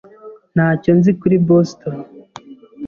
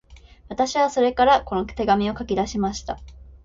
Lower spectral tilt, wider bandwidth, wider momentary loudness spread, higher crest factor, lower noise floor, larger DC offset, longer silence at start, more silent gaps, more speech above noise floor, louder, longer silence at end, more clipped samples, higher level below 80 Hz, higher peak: first, -9 dB/octave vs -5 dB/octave; second, 7 kHz vs 7.8 kHz; about the same, 16 LU vs 15 LU; about the same, 14 dB vs 18 dB; about the same, -40 dBFS vs -42 dBFS; neither; first, 0.25 s vs 0.1 s; neither; first, 26 dB vs 21 dB; first, -15 LUFS vs -22 LUFS; about the same, 0 s vs 0.1 s; neither; second, -52 dBFS vs -42 dBFS; about the same, -2 dBFS vs -4 dBFS